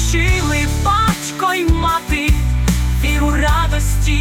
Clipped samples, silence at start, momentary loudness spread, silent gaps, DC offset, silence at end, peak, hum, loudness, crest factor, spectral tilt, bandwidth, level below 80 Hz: under 0.1%; 0 s; 2 LU; none; under 0.1%; 0 s; -4 dBFS; none; -16 LUFS; 12 dB; -4.5 dB/octave; 17.5 kHz; -18 dBFS